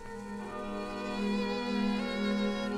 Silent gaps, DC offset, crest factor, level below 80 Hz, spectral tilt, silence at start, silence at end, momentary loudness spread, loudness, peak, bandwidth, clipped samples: none; under 0.1%; 14 dB; -52 dBFS; -6 dB/octave; 0 s; 0 s; 9 LU; -34 LUFS; -20 dBFS; 11.5 kHz; under 0.1%